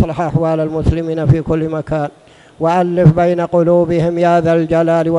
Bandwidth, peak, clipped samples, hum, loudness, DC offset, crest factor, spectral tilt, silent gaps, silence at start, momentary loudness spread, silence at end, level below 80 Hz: 10.5 kHz; 0 dBFS; 0.3%; none; -14 LUFS; under 0.1%; 14 dB; -9 dB/octave; none; 0 s; 8 LU; 0 s; -32 dBFS